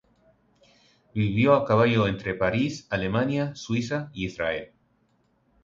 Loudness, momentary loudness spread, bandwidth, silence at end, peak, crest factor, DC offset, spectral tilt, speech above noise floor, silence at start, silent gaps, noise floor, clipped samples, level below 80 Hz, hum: -25 LUFS; 10 LU; 7.6 kHz; 1 s; -6 dBFS; 20 dB; under 0.1%; -6.5 dB/octave; 43 dB; 1.15 s; none; -67 dBFS; under 0.1%; -52 dBFS; none